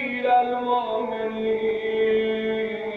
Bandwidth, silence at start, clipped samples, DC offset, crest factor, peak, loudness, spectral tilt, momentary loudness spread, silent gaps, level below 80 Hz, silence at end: 4.6 kHz; 0 s; under 0.1%; under 0.1%; 14 dB; -10 dBFS; -24 LUFS; -6.5 dB/octave; 6 LU; none; -60 dBFS; 0 s